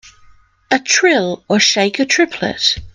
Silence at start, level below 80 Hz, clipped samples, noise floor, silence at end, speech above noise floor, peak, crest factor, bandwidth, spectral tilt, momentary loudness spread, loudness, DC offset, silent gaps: 0.05 s; -46 dBFS; under 0.1%; -47 dBFS; 0.05 s; 32 dB; 0 dBFS; 16 dB; 11 kHz; -2.5 dB/octave; 6 LU; -14 LUFS; under 0.1%; none